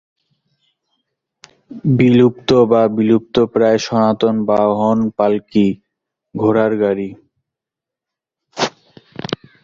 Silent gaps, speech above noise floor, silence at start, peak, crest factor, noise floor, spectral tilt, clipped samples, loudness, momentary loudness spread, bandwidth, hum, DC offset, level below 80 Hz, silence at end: none; 71 dB; 1.7 s; 0 dBFS; 16 dB; -85 dBFS; -7 dB/octave; under 0.1%; -15 LUFS; 15 LU; 7.4 kHz; none; under 0.1%; -54 dBFS; 0.3 s